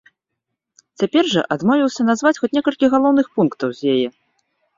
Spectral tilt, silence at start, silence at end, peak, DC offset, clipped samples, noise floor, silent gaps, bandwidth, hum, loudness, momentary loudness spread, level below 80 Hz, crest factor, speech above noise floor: -5.5 dB/octave; 1 s; 0.65 s; -2 dBFS; under 0.1%; under 0.1%; -79 dBFS; none; 7.6 kHz; none; -18 LUFS; 5 LU; -62 dBFS; 16 dB; 62 dB